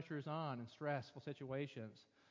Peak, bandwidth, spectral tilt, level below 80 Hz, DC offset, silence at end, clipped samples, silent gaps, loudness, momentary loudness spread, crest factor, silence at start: -28 dBFS; 7.6 kHz; -7.5 dB/octave; -82 dBFS; under 0.1%; 0.3 s; under 0.1%; none; -47 LUFS; 10 LU; 18 dB; 0 s